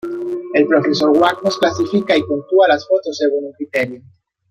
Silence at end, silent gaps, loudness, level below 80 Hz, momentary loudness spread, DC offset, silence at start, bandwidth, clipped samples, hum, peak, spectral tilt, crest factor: 0.5 s; none; -16 LUFS; -58 dBFS; 9 LU; under 0.1%; 0.05 s; 14.5 kHz; under 0.1%; none; 0 dBFS; -5 dB/octave; 16 dB